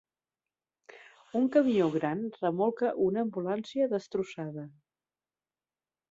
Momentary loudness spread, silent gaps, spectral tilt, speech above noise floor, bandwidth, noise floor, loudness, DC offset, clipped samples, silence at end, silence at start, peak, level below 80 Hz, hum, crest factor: 13 LU; none; -7.5 dB/octave; over 61 dB; 7.8 kHz; under -90 dBFS; -30 LUFS; under 0.1%; under 0.1%; 1.4 s; 0.95 s; -12 dBFS; -74 dBFS; none; 20 dB